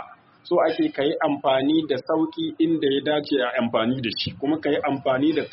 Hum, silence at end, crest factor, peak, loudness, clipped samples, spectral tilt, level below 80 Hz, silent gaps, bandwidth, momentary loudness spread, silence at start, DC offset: none; 0.05 s; 14 dB; -8 dBFS; -23 LUFS; under 0.1%; -3.5 dB/octave; -62 dBFS; none; 5.8 kHz; 4 LU; 0 s; under 0.1%